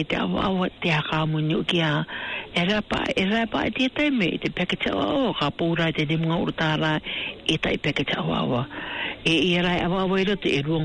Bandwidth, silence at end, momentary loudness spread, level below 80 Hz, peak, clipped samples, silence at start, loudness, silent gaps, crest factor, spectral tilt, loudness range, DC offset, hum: 10 kHz; 0 s; 4 LU; -48 dBFS; -10 dBFS; under 0.1%; 0 s; -24 LUFS; none; 12 dB; -6 dB/octave; 1 LU; under 0.1%; none